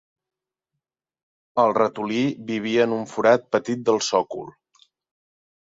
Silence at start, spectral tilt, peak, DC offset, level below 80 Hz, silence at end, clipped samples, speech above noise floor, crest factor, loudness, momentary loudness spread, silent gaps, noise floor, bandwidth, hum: 1.55 s; -4.5 dB/octave; -4 dBFS; under 0.1%; -68 dBFS; 1.25 s; under 0.1%; 62 dB; 20 dB; -22 LUFS; 10 LU; none; -84 dBFS; 7.8 kHz; none